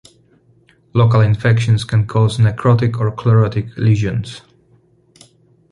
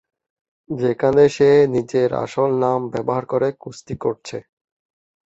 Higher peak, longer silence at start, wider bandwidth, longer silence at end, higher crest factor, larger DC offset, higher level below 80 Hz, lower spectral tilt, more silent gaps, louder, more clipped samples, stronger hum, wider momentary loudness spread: about the same, -2 dBFS vs -2 dBFS; first, 0.95 s vs 0.7 s; first, 10.5 kHz vs 8 kHz; first, 1.35 s vs 0.85 s; about the same, 14 dB vs 18 dB; neither; first, -42 dBFS vs -54 dBFS; about the same, -7.5 dB/octave vs -7 dB/octave; neither; first, -15 LUFS vs -18 LUFS; neither; neither; second, 8 LU vs 17 LU